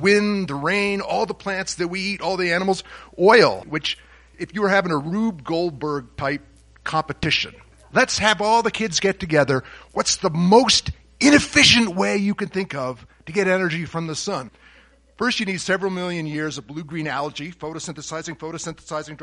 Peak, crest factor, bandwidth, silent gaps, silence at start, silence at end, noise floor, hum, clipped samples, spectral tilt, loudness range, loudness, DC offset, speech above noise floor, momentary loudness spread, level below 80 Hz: 0 dBFS; 20 dB; 11.5 kHz; none; 0 s; 0 s; -53 dBFS; none; under 0.1%; -3.5 dB/octave; 9 LU; -20 LUFS; under 0.1%; 32 dB; 16 LU; -48 dBFS